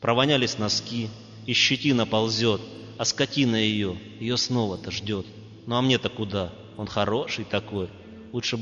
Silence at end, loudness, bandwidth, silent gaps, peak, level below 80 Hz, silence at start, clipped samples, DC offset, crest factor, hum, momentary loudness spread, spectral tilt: 0 s; -25 LUFS; 7.6 kHz; none; -6 dBFS; -58 dBFS; 0 s; under 0.1%; under 0.1%; 20 dB; none; 14 LU; -4 dB/octave